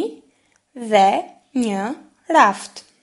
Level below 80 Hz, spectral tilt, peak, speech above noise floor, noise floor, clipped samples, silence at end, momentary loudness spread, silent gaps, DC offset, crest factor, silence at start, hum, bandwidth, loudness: -70 dBFS; -4 dB/octave; 0 dBFS; 43 dB; -61 dBFS; under 0.1%; 0.25 s; 19 LU; none; under 0.1%; 20 dB; 0 s; none; 11.5 kHz; -18 LUFS